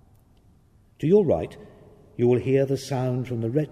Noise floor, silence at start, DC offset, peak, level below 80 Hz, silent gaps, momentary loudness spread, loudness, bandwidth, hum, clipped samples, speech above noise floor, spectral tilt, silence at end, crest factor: -57 dBFS; 1 s; under 0.1%; -8 dBFS; -54 dBFS; none; 9 LU; -23 LUFS; 13 kHz; none; under 0.1%; 35 dB; -8 dB/octave; 0.05 s; 18 dB